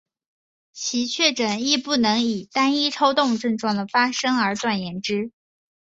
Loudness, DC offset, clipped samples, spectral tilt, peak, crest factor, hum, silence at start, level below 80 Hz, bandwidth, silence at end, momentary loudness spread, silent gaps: -21 LUFS; under 0.1%; under 0.1%; -3 dB/octave; -2 dBFS; 20 dB; none; 0.75 s; -66 dBFS; 8 kHz; 0.55 s; 7 LU; none